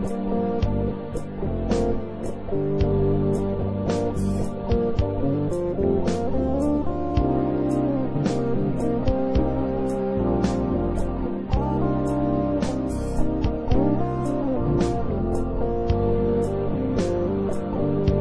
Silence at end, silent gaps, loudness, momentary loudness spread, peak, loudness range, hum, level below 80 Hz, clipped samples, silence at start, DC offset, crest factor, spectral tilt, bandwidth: 0 s; none; -24 LUFS; 4 LU; -8 dBFS; 1 LU; none; -32 dBFS; under 0.1%; 0 s; under 0.1%; 14 dB; -8.5 dB/octave; 11 kHz